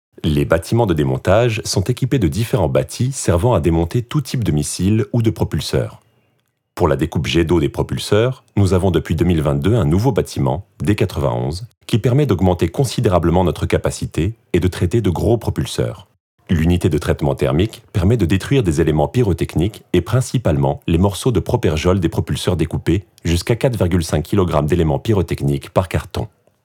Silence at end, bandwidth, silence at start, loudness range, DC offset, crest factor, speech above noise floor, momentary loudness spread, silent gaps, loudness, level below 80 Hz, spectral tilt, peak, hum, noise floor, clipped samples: 0.4 s; 17 kHz; 0.25 s; 2 LU; under 0.1%; 16 dB; 49 dB; 6 LU; 11.77-11.81 s, 16.20-16.38 s; -17 LUFS; -36 dBFS; -6.5 dB/octave; 0 dBFS; none; -65 dBFS; under 0.1%